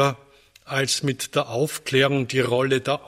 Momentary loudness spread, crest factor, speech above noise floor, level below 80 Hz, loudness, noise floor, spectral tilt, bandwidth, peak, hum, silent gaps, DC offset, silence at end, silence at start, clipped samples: 5 LU; 18 dB; 31 dB; -60 dBFS; -22 LUFS; -53 dBFS; -4 dB/octave; 16 kHz; -4 dBFS; none; none; under 0.1%; 0.1 s; 0 s; under 0.1%